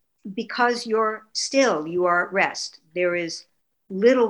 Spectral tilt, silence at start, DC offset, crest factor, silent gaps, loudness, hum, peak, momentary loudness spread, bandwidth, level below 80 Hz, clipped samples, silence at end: -3.5 dB/octave; 0.25 s; under 0.1%; 16 dB; none; -23 LUFS; none; -6 dBFS; 12 LU; 11 kHz; -74 dBFS; under 0.1%; 0 s